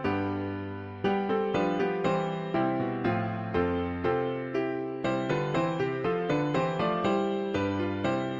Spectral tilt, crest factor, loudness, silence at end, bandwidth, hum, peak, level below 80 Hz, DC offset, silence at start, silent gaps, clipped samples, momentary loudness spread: -7.5 dB/octave; 16 dB; -29 LUFS; 0 s; 7.8 kHz; none; -14 dBFS; -56 dBFS; under 0.1%; 0 s; none; under 0.1%; 4 LU